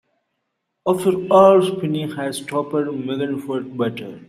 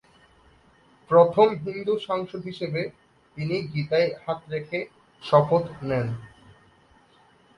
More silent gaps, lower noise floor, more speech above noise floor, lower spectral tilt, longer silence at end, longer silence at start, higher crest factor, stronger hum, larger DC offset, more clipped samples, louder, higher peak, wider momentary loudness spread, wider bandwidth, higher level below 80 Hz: neither; first, -75 dBFS vs -58 dBFS; first, 57 dB vs 34 dB; second, -6 dB/octave vs -8 dB/octave; second, 0.05 s vs 1.3 s; second, 0.85 s vs 1.1 s; about the same, 18 dB vs 22 dB; neither; neither; neither; first, -19 LUFS vs -24 LUFS; about the same, -2 dBFS vs -4 dBFS; about the same, 13 LU vs 15 LU; first, 14.5 kHz vs 9.8 kHz; about the same, -64 dBFS vs -60 dBFS